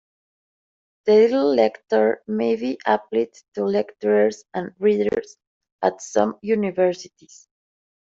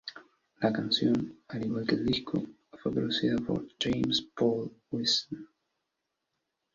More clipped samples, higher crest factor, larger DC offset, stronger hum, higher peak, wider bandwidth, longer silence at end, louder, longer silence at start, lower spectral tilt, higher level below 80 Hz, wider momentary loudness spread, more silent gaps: neither; about the same, 18 dB vs 20 dB; neither; neither; first, -4 dBFS vs -12 dBFS; about the same, 7.8 kHz vs 7.6 kHz; second, 1.1 s vs 1.3 s; first, -21 LUFS vs -30 LUFS; first, 1.05 s vs 0.05 s; about the same, -5.5 dB/octave vs -5 dB/octave; second, -66 dBFS vs -60 dBFS; about the same, 10 LU vs 10 LU; first, 3.48-3.52 s, 5.47-5.61 s, 5.72-5.79 s vs none